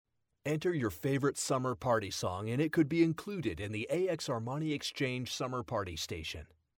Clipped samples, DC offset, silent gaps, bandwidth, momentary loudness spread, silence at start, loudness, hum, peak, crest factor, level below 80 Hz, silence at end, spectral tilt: under 0.1%; under 0.1%; none; 17.5 kHz; 8 LU; 0.45 s; -34 LUFS; none; -18 dBFS; 18 dB; -60 dBFS; 0.35 s; -5 dB/octave